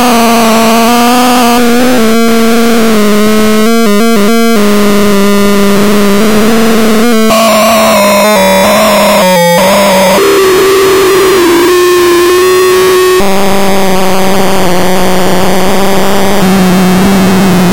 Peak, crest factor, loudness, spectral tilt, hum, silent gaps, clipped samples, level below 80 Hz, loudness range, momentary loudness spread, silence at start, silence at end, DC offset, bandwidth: 0 dBFS; 6 dB; -6 LUFS; -4.5 dB/octave; none; none; under 0.1%; -30 dBFS; 3 LU; 4 LU; 0 s; 0 s; 30%; 17.5 kHz